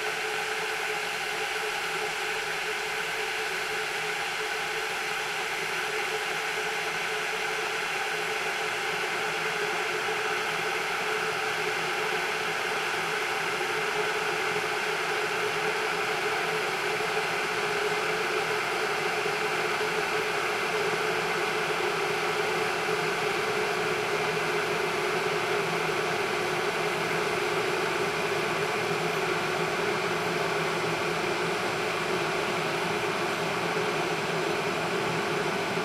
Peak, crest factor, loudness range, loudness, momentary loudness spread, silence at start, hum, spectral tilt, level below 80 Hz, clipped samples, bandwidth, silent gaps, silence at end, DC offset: -14 dBFS; 14 dB; 2 LU; -28 LUFS; 2 LU; 0 s; none; -3 dB/octave; -64 dBFS; under 0.1%; 16 kHz; none; 0 s; under 0.1%